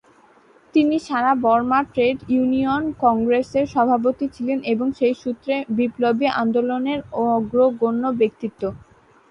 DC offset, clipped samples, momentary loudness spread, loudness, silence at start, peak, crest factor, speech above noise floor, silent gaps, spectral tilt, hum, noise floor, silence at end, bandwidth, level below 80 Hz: under 0.1%; under 0.1%; 6 LU; -20 LUFS; 0.75 s; -4 dBFS; 16 dB; 33 dB; none; -6.5 dB/octave; none; -53 dBFS; 0.55 s; 8 kHz; -54 dBFS